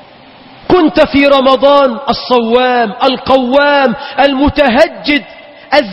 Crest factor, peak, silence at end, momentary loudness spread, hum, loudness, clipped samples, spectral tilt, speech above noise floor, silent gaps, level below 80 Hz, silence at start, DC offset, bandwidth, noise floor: 10 dB; 0 dBFS; 0 s; 6 LU; none; -10 LUFS; 0.7%; -6 dB/octave; 28 dB; none; -34 dBFS; 0.7 s; under 0.1%; 8.8 kHz; -37 dBFS